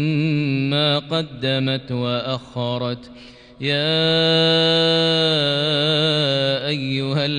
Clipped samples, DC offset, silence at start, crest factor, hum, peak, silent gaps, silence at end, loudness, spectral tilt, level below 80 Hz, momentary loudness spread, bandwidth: under 0.1%; under 0.1%; 0 s; 12 dB; none; -6 dBFS; none; 0 s; -19 LUFS; -6 dB/octave; -54 dBFS; 10 LU; 10 kHz